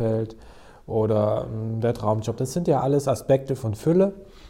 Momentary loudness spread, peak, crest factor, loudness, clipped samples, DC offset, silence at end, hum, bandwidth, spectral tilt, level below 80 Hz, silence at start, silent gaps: 7 LU; -8 dBFS; 14 dB; -24 LUFS; under 0.1%; under 0.1%; 0 s; none; 16 kHz; -7.5 dB/octave; -50 dBFS; 0 s; none